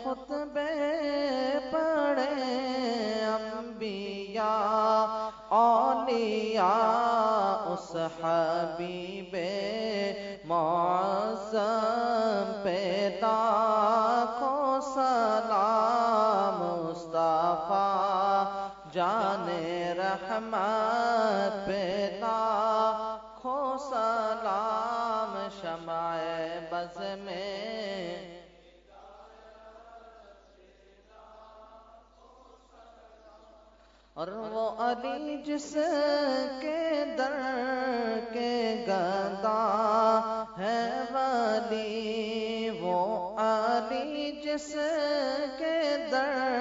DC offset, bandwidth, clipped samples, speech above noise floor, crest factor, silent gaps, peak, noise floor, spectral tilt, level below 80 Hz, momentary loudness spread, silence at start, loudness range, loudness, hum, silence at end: under 0.1%; 7.4 kHz; under 0.1%; 30 dB; 18 dB; none; -12 dBFS; -59 dBFS; -3 dB/octave; -66 dBFS; 10 LU; 0 s; 9 LU; -29 LUFS; none; 0 s